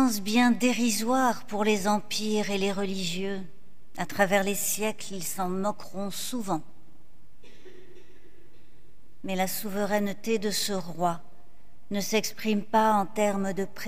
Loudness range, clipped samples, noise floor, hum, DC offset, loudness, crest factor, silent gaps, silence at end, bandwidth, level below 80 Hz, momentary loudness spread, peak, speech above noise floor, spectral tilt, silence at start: 10 LU; under 0.1%; -59 dBFS; none; 2%; -28 LUFS; 20 dB; none; 0 s; 16 kHz; -64 dBFS; 11 LU; -8 dBFS; 32 dB; -4 dB/octave; 0 s